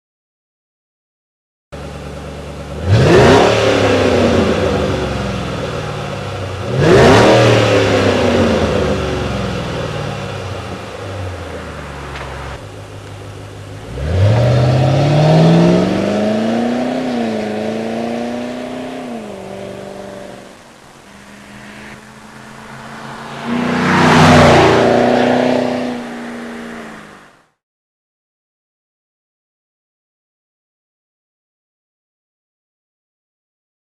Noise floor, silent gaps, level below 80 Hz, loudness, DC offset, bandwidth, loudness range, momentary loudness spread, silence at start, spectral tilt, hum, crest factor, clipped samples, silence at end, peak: -44 dBFS; none; -36 dBFS; -13 LUFS; under 0.1%; 13.5 kHz; 17 LU; 23 LU; 1.7 s; -6 dB/octave; none; 14 dB; under 0.1%; 6.7 s; -2 dBFS